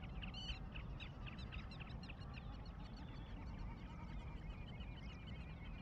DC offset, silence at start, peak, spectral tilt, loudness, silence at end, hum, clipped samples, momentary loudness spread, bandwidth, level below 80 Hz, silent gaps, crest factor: under 0.1%; 0 s; -34 dBFS; -6.5 dB/octave; -52 LUFS; 0 s; none; under 0.1%; 4 LU; 8 kHz; -52 dBFS; none; 16 dB